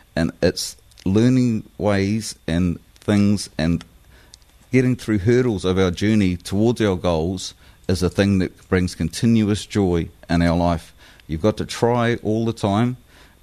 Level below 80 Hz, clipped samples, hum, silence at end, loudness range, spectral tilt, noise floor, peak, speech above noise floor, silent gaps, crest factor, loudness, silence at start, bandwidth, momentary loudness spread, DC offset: -42 dBFS; under 0.1%; none; 0.45 s; 2 LU; -6.5 dB/octave; -49 dBFS; -4 dBFS; 30 dB; none; 16 dB; -20 LUFS; 0.15 s; 13.5 kHz; 7 LU; under 0.1%